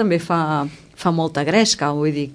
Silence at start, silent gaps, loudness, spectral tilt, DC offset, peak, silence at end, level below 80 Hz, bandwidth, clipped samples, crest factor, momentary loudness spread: 0 s; none; -19 LUFS; -4.5 dB/octave; under 0.1%; -2 dBFS; 0 s; -56 dBFS; 11 kHz; under 0.1%; 16 dB; 8 LU